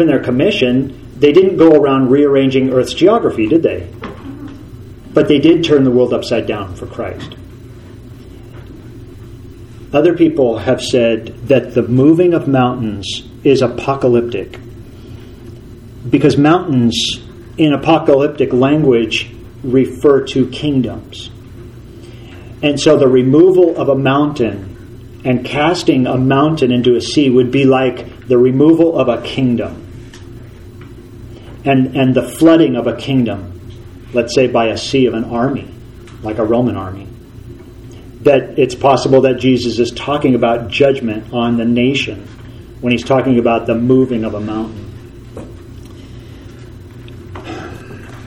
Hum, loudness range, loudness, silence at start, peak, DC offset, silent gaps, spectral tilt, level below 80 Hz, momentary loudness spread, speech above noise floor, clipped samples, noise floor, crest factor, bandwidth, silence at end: none; 6 LU; -13 LUFS; 0 s; 0 dBFS; under 0.1%; none; -6.5 dB/octave; -40 dBFS; 24 LU; 22 dB; under 0.1%; -33 dBFS; 14 dB; 12 kHz; 0 s